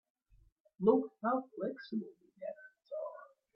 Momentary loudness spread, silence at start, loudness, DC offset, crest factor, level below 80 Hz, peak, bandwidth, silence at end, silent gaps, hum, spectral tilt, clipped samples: 19 LU; 0.8 s; -37 LUFS; under 0.1%; 24 dB; -76 dBFS; -14 dBFS; 5.6 kHz; 0.3 s; none; none; -10 dB/octave; under 0.1%